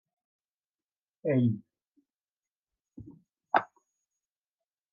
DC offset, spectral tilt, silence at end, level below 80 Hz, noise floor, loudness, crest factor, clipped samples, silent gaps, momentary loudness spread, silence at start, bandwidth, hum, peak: under 0.1%; -10 dB/octave; 1.3 s; -76 dBFS; under -90 dBFS; -30 LUFS; 28 dB; under 0.1%; 2.23-2.37 s, 2.52-2.61 s; 24 LU; 1.25 s; 5.2 kHz; none; -8 dBFS